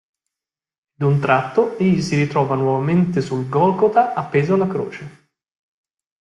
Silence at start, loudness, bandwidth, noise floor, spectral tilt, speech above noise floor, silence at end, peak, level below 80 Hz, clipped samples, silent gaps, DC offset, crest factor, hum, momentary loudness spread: 1 s; -18 LUFS; 11 kHz; -88 dBFS; -7.5 dB/octave; 71 dB; 1.1 s; -2 dBFS; -56 dBFS; under 0.1%; none; under 0.1%; 18 dB; none; 7 LU